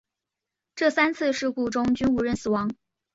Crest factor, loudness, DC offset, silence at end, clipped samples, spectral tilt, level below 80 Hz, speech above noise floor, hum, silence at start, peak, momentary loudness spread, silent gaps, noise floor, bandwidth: 20 dB; -25 LUFS; under 0.1%; 0.4 s; under 0.1%; -5 dB/octave; -54 dBFS; 63 dB; none; 0.75 s; -6 dBFS; 9 LU; none; -86 dBFS; 8 kHz